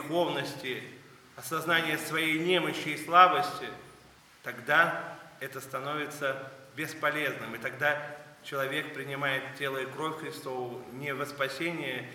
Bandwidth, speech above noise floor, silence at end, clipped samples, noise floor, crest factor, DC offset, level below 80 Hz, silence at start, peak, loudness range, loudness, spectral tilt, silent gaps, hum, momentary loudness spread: 19.5 kHz; 26 dB; 0 s; under 0.1%; -57 dBFS; 26 dB; under 0.1%; -76 dBFS; 0 s; -4 dBFS; 7 LU; -30 LUFS; -4 dB/octave; none; none; 16 LU